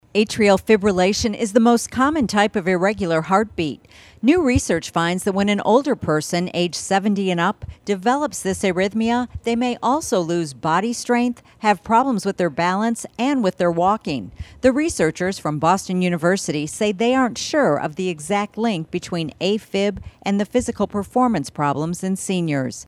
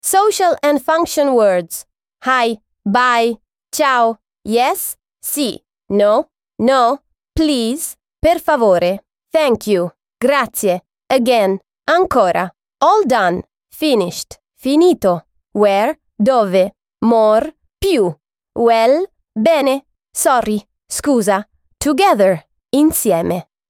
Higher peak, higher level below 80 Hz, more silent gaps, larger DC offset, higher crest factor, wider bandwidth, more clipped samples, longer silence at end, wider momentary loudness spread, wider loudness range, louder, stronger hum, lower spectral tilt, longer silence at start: about the same, 0 dBFS vs -2 dBFS; about the same, -46 dBFS vs -44 dBFS; neither; neither; about the same, 18 dB vs 14 dB; second, 14 kHz vs 18 kHz; neither; second, 0.05 s vs 0.25 s; second, 7 LU vs 12 LU; about the same, 3 LU vs 2 LU; second, -20 LUFS vs -15 LUFS; neither; about the same, -5 dB/octave vs -4 dB/octave; about the same, 0.15 s vs 0.05 s